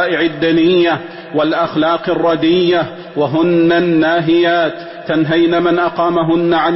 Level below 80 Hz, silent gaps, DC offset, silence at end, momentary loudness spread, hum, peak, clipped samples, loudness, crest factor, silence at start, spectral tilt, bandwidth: -50 dBFS; none; under 0.1%; 0 s; 7 LU; none; -2 dBFS; under 0.1%; -13 LUFS; 10 dB; 0 s; -10 dB/octave; 5.8 kHz